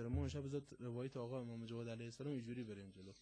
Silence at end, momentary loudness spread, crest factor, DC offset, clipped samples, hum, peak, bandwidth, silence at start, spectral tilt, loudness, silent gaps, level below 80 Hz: 0 s; 7 LU; 16 dB; under 0.1%; under 0.1%; none; -30 dBFS; 10 kHz; 0 s; -7 dB/octave; -48 LUFS; none; -62 dBFS